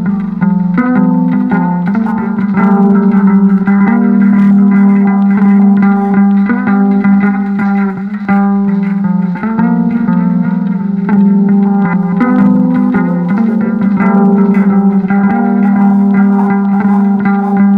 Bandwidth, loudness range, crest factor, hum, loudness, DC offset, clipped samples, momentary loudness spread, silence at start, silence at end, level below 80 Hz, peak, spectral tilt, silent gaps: 2.8 kHz; 3 LU; 8 dB; none; -10 LUFS; under 0.1%; under 0.1%; 5 LU; 0 s; 0 s; -46 dBFS; 0 dBFS; -11 dB/octave; none